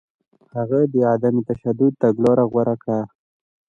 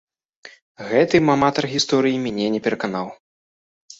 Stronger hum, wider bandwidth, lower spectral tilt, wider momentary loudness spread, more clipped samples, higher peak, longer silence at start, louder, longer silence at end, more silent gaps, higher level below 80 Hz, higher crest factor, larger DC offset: neither; about the same, 7.4 kHz vs 8 kHz; first, -10.5 dB/octave vs -5 dB/octave; about the same, 9 LU vs 11 LU; neither; about the same, -4 dBFS vs -2 dBFS; about the same, 0.55 s vs 0.45 s; about the same, -19 LUFS vs -19 LUFS; first, 0.6 s vs 0.05 s; second, none vs 0.62-0.75 s, 3.20-3.88 s; about the same, -60 dBFS vs -58 dBFS; about the same, 16 dB vs 18 dB; neither